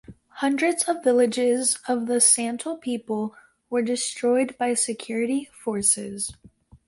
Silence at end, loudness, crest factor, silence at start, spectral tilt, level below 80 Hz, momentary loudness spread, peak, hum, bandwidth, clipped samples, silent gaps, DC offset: 0.1 s; -23 LUFS; 20 dB; 0.1 s; -2.5 dB/octave; -62 dBFS; 12 LU; -4 dBFS; none; 12 kHz; under 0.1%; none; under 0.1%